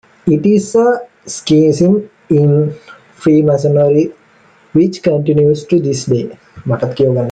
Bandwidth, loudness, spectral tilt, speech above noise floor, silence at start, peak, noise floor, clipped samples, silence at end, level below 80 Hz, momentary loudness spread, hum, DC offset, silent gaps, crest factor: 9.2 kHz; -13 LUFS; -7.5 dB/octave; 36 dB; 0.25 s; -2 dBFS; -47 dBFS; under 0.1%; 0 s; -50 dBFS; 9 LU; none; under 0.1%; none; 10 dB